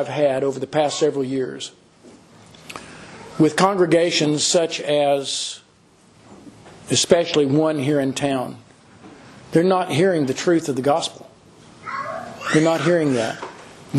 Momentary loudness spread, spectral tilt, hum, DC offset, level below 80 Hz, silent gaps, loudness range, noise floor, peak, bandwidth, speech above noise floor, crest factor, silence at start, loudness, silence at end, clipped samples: 18 LU; -4.5 dB/octave; none; under 0.1%; -62 dBFS; none; 3 LU; -53 dBFS; 0 dBFS; 12.5 kHz; 34 dB; 20 dB; 0 s; -20 LUFS; 0 s; under 0.1%